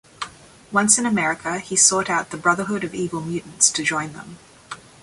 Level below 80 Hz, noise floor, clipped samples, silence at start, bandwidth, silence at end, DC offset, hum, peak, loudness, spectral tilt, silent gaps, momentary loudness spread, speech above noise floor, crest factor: -58 dBFS; -42 dBFS; under 0.1%; 0.2 s; 11.5 kHz; 0.25 s; under 0.1%; none; 0 dBFS; -19 LUFS; -2 dB/octave; none; 19 LU; 21 dB; 22 dB